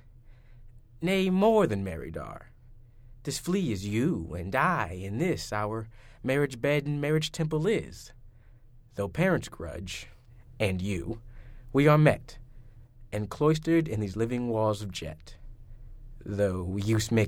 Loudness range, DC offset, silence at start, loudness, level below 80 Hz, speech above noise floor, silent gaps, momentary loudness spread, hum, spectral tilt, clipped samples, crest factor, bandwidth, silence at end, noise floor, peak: 5 LU; under 0.1%; 0.3 s; -28 LUFS; -48 dBFS; 25 dB; none; 17 LU; none; -6 dB/octave; under 0.1%; 22 dB; 16 kHz; 0 s; -53 dBFS; -8 dBFS